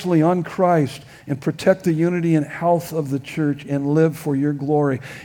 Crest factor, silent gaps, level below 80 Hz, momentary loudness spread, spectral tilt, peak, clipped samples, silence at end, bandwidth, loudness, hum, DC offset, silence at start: 16 dB; none; -60 dBFS; 7 LU; -7.5 dB/octave; -2 dBFS; under 0.1%; 0 s; 18.5 kHz; -20 LUFS; none; under 0.1%; 0 s